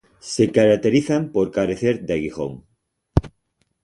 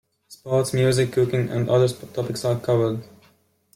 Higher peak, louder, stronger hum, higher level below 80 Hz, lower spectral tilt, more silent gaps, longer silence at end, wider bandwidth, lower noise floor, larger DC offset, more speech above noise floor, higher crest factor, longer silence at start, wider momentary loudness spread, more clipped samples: first, 0 dBFS vs -8 dBFS; about the same, -20 LUFS vs -22 LUFS; neither; first, -38 dBFS vs -56 dBFS; about the same, -6.5 dB/octave vs -6.5 dB/octave; neither; second, 0.55 s vs 0.7 s; second, 11.5 kHz vs 15.5 kHz; first, -69 dBFS vs -60 dBFS; neither; first, 50 dB vs 39 dB; about the same, 20 dB vs 16 dB; about the same, 0.25 s vs 0.3 s; first, 12 LU vs 9 LU; neither